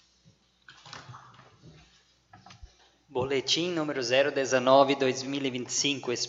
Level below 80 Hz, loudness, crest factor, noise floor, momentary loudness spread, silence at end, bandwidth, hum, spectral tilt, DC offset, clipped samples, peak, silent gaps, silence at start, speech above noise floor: -64 dBFS; -26 LUFS; 22 dB; -63 dBFS; 24 LU; 0 s; 8 kHz; none; -3 dB/octave; under 0.1%; under 0.1%; -8 dBFS; none; 0.7 s; 37 dB